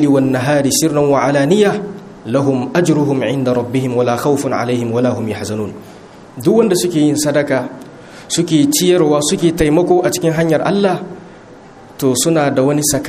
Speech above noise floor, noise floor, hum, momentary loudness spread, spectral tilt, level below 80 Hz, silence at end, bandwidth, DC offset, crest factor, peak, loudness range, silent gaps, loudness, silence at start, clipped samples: 24 dB; -38 dBFS; none; 11 LU; -5 dB/octave; -44 dBFS; 0 s; 15.5 kHz; under 0.1%; 14 dB; 0 dBFS; 3 LU; none; -14 LUFS; 0 s; under 0.1%